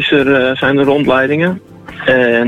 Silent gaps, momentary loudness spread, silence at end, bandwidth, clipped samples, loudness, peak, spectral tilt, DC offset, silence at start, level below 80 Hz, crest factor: none; 8 LU; 0 s; 11 kHz; under 0.1%; -12 LUFS; 0 dBFS; -7 dB/octave; under 0.1%; 0 s; -46 dBFS; 12 dB